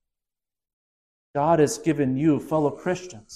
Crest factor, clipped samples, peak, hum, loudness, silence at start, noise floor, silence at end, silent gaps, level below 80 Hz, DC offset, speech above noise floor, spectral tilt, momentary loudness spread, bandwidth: 18 dB; under 0.1%; -8 dBFS; none; -23 LUFS; 1.35 s; under -90 dBFS; 0 s; none; -58 dBFS; under 0.1%; over 67 dB; -6.5 dB/octave; 9 LU; 14 kHz